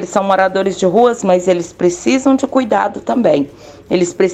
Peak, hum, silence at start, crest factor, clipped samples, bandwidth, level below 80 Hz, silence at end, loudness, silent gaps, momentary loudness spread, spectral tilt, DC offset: 0 dBFS; none; 0 s; 12 dB; under 0.1%; 9.2 kHz; -50 dBFS; 0 s; -14 LUFS; none; 5 LU; -5 dB/octave; under 0.1%